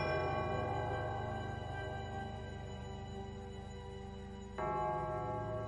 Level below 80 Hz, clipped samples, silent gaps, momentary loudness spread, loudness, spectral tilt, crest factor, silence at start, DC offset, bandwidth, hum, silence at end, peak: -54 dBFS; under 0.1%; none; 11 LU; -41 LUFS; -7 dB/octave; 16 dB; 0 s; under 0.1%; 11 kHz; none; 0 s; -24 dBFS